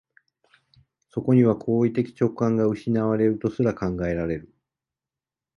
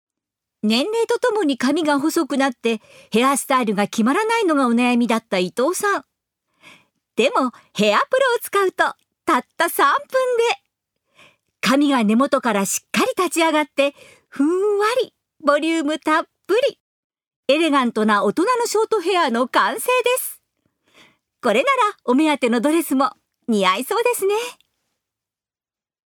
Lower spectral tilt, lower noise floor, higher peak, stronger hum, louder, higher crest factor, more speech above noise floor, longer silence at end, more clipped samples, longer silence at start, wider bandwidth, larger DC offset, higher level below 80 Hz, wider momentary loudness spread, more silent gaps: first, -9.5 dB/octave vs -3.5 dB/octave; about the same, -90 dBFS vs under -90 dBFS; second, -6 dBFS vs -2 dBFS; neither; second, -23 LUFS vs -19 LUFS; about the same, 18 dB vs 18 dB; second, 68 dB vs over 72 dB; second, 1.15 s vs 1.65 s; neither; first, 1.15 s vs 0.65 s; second, 6.8 kHz vs over 20 kHz; neither; first, -50 dBFS vs -72 dBFS; first, 10 LU vs 6 LU; second, none vs 16.80-17.10 s, 17.27-17.43 s